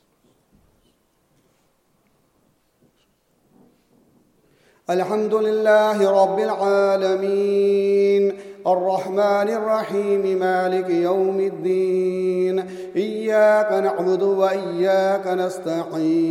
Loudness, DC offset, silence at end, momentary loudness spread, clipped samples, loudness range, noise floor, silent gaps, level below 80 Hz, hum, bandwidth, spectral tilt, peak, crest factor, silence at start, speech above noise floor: -20 LUFS; under 0.1%; 0 s; 7 LU; under 0.1%; 4 LU; -64 dBFS; none; -72 dBFS; none; 13.5 kHz; -6.5 dB/octave; -4 dBFS; 16 dB; 4.9 s; 45 dB